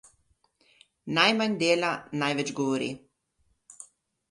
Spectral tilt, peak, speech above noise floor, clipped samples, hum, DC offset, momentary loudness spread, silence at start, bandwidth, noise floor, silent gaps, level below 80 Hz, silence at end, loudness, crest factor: -4 dB/octave; -6 dBFS; 46 dB; under 0.1%; none; under 0.1%; 25 LU; 1.05 s; 11.5 kHz; -72 dBFS; none; -72 dBFS; 0.45 s; -26 LUFS; 24 dB